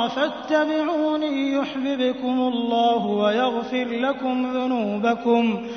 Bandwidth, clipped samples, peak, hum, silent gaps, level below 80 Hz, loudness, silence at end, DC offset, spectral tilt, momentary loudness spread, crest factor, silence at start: 6.6 kHz; under 0.1%; -6 dBFS; none; none; -62 dBFS; -22 LUFS; 0 s; under 0.1%; -6 dB/octave; 4 LU; 16 dB; 0 s